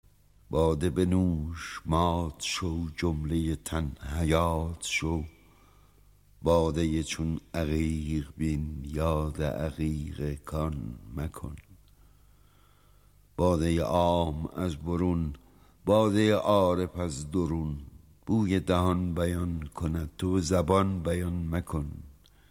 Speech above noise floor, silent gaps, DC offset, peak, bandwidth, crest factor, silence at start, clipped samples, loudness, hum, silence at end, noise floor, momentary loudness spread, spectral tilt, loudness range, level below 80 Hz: 32 dB; none; under 0.1%; -10 dBFS; 16 kHz; 20 dB; 0.5 s; under 0.1%; -29 LUFS; 50 Hz at -55 dBFS; 0.4 s; -60 dBFS; 12 LU; -6.5 dB/octave; 6 LU; -42 dBFS